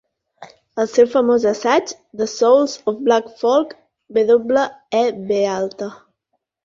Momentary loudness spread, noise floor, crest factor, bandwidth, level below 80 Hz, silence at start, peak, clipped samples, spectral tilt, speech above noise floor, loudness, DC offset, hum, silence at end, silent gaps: 11 LU; -73 dBFS; 16 dB; 7.6 kHz; -62 dBFS; 0.4 s; -2 dBFS; under 0.1%; -4 dB/octave; 56 dB; -17 LUFS; under 0.1%; none; 0.7 s; none